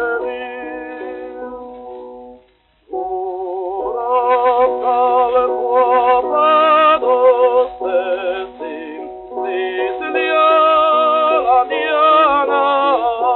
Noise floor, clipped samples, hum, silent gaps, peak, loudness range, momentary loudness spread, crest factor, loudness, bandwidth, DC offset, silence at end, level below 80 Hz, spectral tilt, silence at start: -54 dBFS; under 0.1%; none; none; -2 dBFS; 13 LU; 17 LU; 14 dB; -14 LUFS; 4.2 kHz; under 0.1%; 0 s; -54 dBFS; 0.5 dB/octave; 0 s